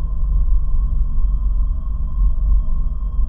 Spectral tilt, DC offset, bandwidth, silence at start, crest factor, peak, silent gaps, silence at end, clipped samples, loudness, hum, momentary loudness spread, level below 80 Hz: -11.5 dB/octave; under 0.1%; 1.3 kHz; 0 s; 10 dB; -6 dBFS; none; 0 s; under 0.1%; -23 LUFS; none; 4 LU; -16 dBFS